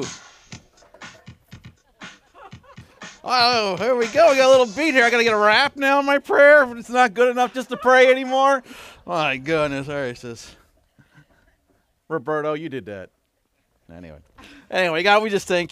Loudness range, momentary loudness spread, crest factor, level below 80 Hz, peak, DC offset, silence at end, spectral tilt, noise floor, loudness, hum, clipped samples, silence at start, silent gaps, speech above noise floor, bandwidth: 16 LU; 18 LU; 18 dB; -60 dBFS; -4 dBFS; under 0.1%; 0.05 s; -3.5 dB/octave; -69 dBFS; -18 LUFS; none; under 0.1%; 0 s; none; 51 dB; 13.5 kHz